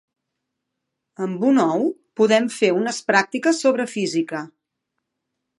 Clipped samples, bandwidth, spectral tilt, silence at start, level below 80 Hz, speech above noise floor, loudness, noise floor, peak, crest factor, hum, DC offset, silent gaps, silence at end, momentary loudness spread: under 0.1%; 11.5 kHz; -4.5 dB/octave; 1.2 s; -78 dBFS; 60 dB; -20 LUFS; -80 dBFS; -2 dBFS; 20 dB; none; under 0.1%; none; 1.15 s; 11 LU